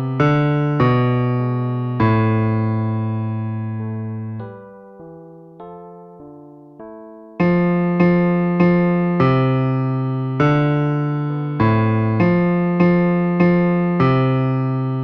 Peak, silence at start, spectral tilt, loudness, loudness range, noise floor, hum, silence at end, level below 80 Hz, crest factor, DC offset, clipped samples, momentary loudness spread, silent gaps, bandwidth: -4 dBFS; 0 s; -10 dB/octave; -18 LUFS; 12 LU; -40 dBFS; none; 0 s; -48 dBFS; 14 dB; under 0.1%; under 0.1%; 13 LU; none; 5.4 kHz